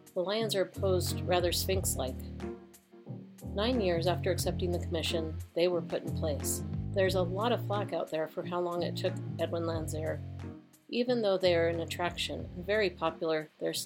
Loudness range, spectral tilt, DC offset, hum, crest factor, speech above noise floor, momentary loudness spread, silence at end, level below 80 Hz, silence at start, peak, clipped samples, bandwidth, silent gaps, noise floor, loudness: 2 LU; -5 dB/octave; under 0.1%; none; 18 dB; 23 dB; 11 LU; 0 s; -50 dBFS; 0.05 s; -14 dBFS; under 0.1%; 16.5 kHz; none; -54 dBFS; -32 LUFS